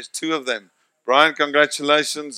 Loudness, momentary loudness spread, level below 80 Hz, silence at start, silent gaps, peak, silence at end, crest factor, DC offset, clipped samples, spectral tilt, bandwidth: -18 LUFS; 11 LU; -76 dBFS; 0 s; none; 0 dBFS; 0 s; 20 dB; under 0.1%; under 0.1%; -2 dB/octave; 15.5 kHz